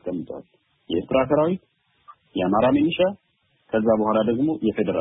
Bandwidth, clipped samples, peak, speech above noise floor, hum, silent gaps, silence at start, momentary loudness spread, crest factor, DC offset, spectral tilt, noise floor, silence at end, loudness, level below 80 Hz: 3.9 kHz; under 0.1%; -6 dBFS; 31 dB; none; none; 0.05 s; 13 LU; 16 dB; under 0.1%; -11.5 dB/octave; -52 dBFS; 0 s; -22 LUFS; -54 dBFS